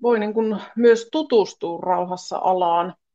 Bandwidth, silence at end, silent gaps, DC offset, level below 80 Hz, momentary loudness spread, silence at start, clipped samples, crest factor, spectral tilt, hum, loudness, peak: 7.8 kHz; 0.25 s; none; under 0.1%; -74 dBFS; 8 LU; 0 s; under 0.1%; 16 dB; -5.5 dB/octave; none; -21 LUFS; -4 dBFS